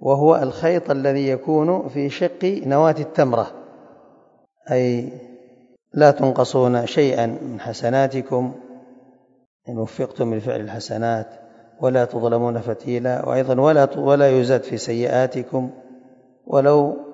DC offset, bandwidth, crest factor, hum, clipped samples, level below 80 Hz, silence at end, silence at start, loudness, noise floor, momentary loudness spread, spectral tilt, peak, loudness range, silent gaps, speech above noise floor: under 0.1%; 8 kHz; 20 dB; none; under 0.1%; -66 dBFS; 0 s; 0 s; -19 LUFS; -56 dBFS; 12 LU; -7 dB/octave; 0 dBFS; 6 LU; 9.46-9.60 s; 37 dB